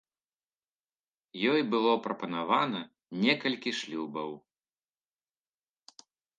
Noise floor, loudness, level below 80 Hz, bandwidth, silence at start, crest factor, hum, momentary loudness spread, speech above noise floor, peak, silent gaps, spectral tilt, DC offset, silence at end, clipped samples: under -90 dBFS; -30 LUFS; -84 dBFS; 9.6 kHz; 1.35 s; 24 dB; none; 14 LU; over 60 dB; -10 dBFS; none; -5 dB/octave; under 0.1%; 2 s; under 0.1%